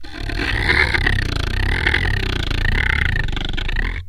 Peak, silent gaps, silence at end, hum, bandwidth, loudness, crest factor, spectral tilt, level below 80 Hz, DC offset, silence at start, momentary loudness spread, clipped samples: 0 dBFS; none; 0 s; none; 15.5 kHz; -19 LUFS; 18 dB; -5 dB/octave; -22 dBFS; under 0.1%; 0 s; 8 LU; under 0.1%